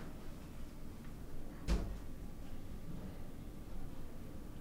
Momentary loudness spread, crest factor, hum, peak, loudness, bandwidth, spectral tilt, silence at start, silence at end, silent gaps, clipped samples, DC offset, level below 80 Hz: 11 LU; 18 dB; none; -24 dBFS; -49 LUFS; 16 kHz; -6.5 dB/octave; 0 s; 0 s; none; under 0.1%; under 0.1%; -46 dBFS